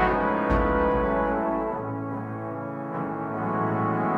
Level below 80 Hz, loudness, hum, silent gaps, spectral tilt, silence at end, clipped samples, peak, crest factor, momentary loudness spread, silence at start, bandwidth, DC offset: -38 dBFS; -26 LUFS; none; none; -9 dB/octave; 0 s; under 0.1%; -10 dBFS; 16 dB; 10 LU; 0 s; 6.8 kHz; under 0.1%